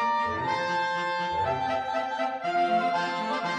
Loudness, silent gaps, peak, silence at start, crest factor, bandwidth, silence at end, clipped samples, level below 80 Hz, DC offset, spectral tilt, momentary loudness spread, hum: -27 LUFS; none; -16 dBFS; 0 s; 12 dB; 10 kHz; 0 s; under 0.1%; -60 dBFS; under 0.1%; -4.5 dB/octave; 4 LU; none